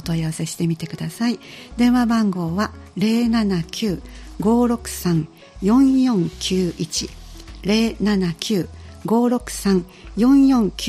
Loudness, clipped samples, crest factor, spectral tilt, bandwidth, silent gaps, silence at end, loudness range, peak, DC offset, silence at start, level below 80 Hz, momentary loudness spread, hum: -20 LUFS; under 0.1%; 16 dB; -5.5 dB/octave; 15 kHz; none; 0 s; 2 LU; -2 dBFS; under 0.1%; 0 s; -40 dBFS; 14 LU; none